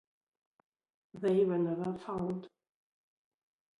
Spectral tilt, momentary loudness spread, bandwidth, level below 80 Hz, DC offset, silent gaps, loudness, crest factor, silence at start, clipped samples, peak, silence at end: -9 dB/octave; 9 LU; 10.5 kHz; -72 dBFS; under 0.1%; none; -34 LUFS; 18 dB; 1.15 s; under 0.1%; -20 dBFS; 1.3 s